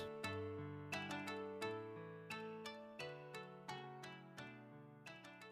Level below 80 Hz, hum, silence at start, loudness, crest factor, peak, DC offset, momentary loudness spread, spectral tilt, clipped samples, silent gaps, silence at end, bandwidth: -86 dBFS; none; 0 s; -50 LUFS; 20 dB; -30 dBFS; under 0.1%; 10 LU; -5 dB/octave; under 0.1%; none; 0 s; 15 kHz